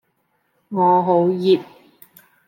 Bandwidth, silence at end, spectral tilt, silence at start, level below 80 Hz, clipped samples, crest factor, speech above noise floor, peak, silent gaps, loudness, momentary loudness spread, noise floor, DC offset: 16.5 kHz; 0.85 s; -8.5 dB/octave; 0.7 s; -74 dBFS; under 0.1%; 16 dB; 51 dB; -4 dBFS; none; -18 LUFS; 5 LU; -67 dBFS; under 0.1%